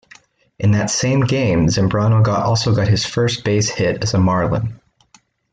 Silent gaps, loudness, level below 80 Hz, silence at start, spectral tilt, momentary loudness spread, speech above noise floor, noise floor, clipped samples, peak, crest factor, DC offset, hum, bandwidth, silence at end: none; -17 LUFS; -42 dBFS; 0.6 s; -5.5 dB/octave; 4 LU; 38 dB; -54 dBFS; under 0.1%; -4 dBFS; 12 dB; under 0.1%; none; 9.2 kHz; 0.75 s